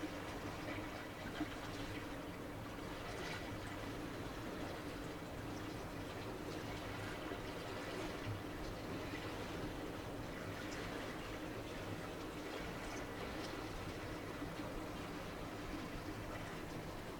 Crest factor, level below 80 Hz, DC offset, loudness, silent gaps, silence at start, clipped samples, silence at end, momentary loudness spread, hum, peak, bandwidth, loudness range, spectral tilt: 16 dB; -56 dBFS; under 0.1%; -46 LUFS; none; 0 s; under 0.1%; 0 s; 2 LU; none; -30 dBFS; 19 kHz; 1 LU; -5 dB/octave